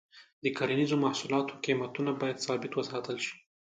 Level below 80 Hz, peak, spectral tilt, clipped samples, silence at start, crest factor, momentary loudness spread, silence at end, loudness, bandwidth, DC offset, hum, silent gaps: -76 dBFS; -14 dBFS; -5 dB/octave; under 0.1%; 0.15 s; 18 dB; 7 LU; 0.4 s; -32 LUFS; 9.2 kHz; under 0.1%; none; 0.33-0.42 s